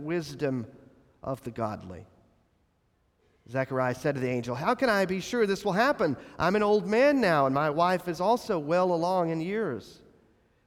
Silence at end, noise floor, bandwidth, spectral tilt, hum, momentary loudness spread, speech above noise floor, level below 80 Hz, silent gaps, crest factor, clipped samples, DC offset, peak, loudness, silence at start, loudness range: 0.75 s; -70 dBFS; 16.5 kHz; -6 dB/octave; none; 12 LU; 43 dB; -62 dBFS; none; 16 dB; under 0.1%; under 0.1%; -12 dBFS; -27 LUFS; 0 s; 11 LU